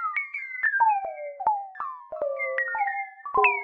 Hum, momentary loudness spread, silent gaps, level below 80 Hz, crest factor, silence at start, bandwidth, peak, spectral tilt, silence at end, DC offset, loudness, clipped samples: none; 13 LU; none; -68 dBFS; 18 dB; 0 s; 5 kHz; -8 dBFS; -5 dB/octave; 0 s; under 0.1%; -27 LUFS; under 0.1%